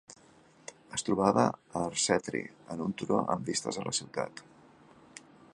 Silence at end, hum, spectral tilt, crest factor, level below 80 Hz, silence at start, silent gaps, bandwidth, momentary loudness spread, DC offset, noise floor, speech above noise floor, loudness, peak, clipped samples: 0.35 s; none; -4 dB/octave; 24 dB; -66 dBFS; 0.1 s; none; 11.5 kHz; 23 LU; under 0.1%; -60 dBFS; 29 dB; -31 LUFS; -10 dBFS; under 0.1%